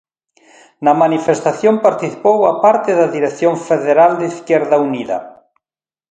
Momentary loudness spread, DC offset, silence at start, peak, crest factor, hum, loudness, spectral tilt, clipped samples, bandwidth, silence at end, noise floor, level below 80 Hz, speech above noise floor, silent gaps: 7 LU; under 0.1%; 0.8 s; 0 dBFS; 14 dB; none; -14 LUFS; -6 dB/octave; under 0.1%; 9.2 kHz; 0.8 s; under -90 dBFS; -64 dBFS; over 77 dB; none